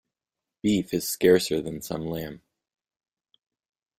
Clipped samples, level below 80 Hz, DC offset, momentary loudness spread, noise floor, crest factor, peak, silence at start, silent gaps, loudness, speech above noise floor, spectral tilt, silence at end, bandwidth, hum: under 0.1%; -58 dBFS; under 0.1%; 13 LU; -89 dBFS; 22 dB; -6 dBFS; 0.65 s; none; -25 LUFS; 64 dB; -5 dB/octave; 1.6 s; 16 kHz; none